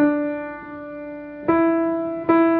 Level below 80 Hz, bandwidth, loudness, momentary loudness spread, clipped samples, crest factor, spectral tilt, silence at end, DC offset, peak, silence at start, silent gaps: -56 dBFS; 4 kHz; -21 LUFS; 15 LU; under 0.1%; 16 dB; -10.5 dB/octave; 0 s; under 0.1%; -4 dBFS; 0 s; none